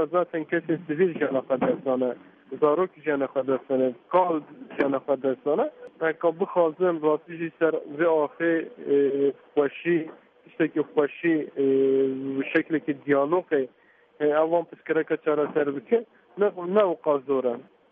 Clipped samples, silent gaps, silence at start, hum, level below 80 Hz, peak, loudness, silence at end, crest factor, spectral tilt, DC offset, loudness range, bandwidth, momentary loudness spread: under 0.1%; none; 0 s; none; -76 dBFS; -8 dBFS; -25 LUFS; 0.3 s; 18 dB; -5.5 dB/octave; under 0.1%; 1 LU; 3.8 kHz; 6 LU